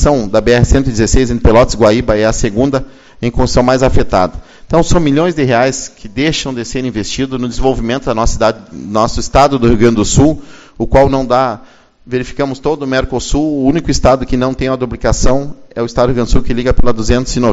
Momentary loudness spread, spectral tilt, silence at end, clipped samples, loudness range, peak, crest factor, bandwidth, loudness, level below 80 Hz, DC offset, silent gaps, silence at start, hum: 9 LU; -5.5 dB/octave; 0 s; 0.4%; 3 LU; 0 dBFS; 12 dB; 8 kHz; -13 LUFS; -20 dBFS; under 0.1%; none; 0 s; none